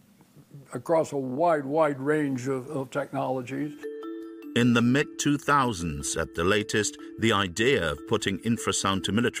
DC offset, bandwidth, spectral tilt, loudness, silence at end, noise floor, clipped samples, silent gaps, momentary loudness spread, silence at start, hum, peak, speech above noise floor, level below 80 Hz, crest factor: under 0.1%; 16 kHz; -4.5 dB/octave; -26 LUFS; 0 s; -56 dBFS; under 0.1%; none; 10 LU; 0.35 s; none; -10 dBFS; 30 dB; -52 dBFS; 16 dB